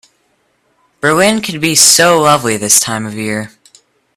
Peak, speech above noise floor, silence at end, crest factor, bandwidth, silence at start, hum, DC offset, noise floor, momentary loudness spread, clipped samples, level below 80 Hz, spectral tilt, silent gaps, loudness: 0 dBFS; 48 dB; 0.7 s; 14 dB; over 20 kHz; 1.05 s; none; under 0.1%; -59 dBFS; 14 LU; 0.2%; -52 dBFS; -2 dB/octave; none; -10 LUFS